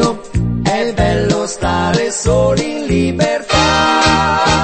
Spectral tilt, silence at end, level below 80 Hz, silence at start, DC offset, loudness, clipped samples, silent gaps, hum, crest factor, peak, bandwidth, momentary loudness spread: -4.5 dB/octave; 0 s; -28 dBFS; 0 s; under 0.1%; -14 LUFS; under 0.1%; none; none; 14 dB; 0 dBFS; 8.8 kHz; 6 LU